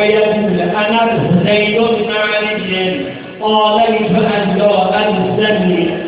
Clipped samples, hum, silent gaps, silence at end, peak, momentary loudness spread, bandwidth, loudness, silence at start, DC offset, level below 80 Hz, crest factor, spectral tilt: under 0.1%; none; none; 0 s; 0 dBFS; 4 LU; 4 kHz; -13 LUFS; 0 s; under 0.1%; -46 dBFS; 12 dB; -10 dB/octave